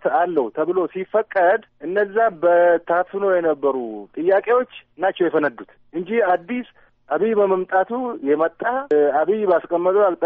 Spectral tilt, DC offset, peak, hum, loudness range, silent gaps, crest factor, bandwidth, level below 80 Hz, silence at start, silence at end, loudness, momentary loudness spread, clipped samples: -4 dB/octave; under 0.1%; -6 dBFS; none; 3 LU; none; 12 dB; 4.2 kHz; -66 dBFS; 0.05 s; 0 s; -20 LUFS; 8 LU; under 0.1%